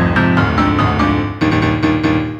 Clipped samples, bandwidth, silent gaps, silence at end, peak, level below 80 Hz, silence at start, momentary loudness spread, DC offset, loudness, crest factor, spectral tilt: under 0.1%; 8.4 kHz; none; 0 s; 0 dBFS; -28 dBFS; 0 s; 3 LU; under 0.1%; -14 LUFS; 14 dB; -7.5 dB/octave